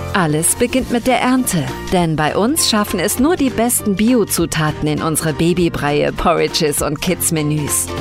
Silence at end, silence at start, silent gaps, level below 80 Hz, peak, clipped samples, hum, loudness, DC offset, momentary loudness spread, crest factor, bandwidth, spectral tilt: 0 s; 0 s; none; -36 dBFS; -2 dBFS; under 0.1%; none; -15 LUFS; under 0.1%; 4 LU; 14 dB; 16.5 kHz; -4 dB/octave